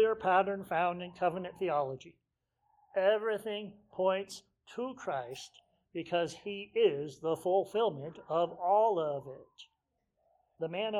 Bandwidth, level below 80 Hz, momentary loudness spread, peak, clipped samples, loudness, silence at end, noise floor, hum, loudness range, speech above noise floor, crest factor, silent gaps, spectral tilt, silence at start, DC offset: 14 kHz; -74 dBFS; 16 LU; -14 dBFS; under 0.1%; -33 LUFS; 0 s; -82 dBFS; none; 4 LU; 49 dB; 20 dB; none; -5 dB/octave; 0 s; under 0.1%